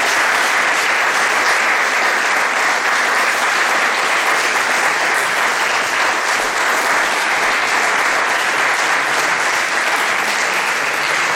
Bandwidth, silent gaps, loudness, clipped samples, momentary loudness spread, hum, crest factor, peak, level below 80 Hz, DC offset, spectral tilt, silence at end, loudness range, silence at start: 17.5 kHz; none; -14 LUFS; under 0.1%; 2 LU; none; 12 dB; -4 dBFS; -60 dBFS; under 0.1%; 0 dB/octave; 0 s; 1 LU; 0 s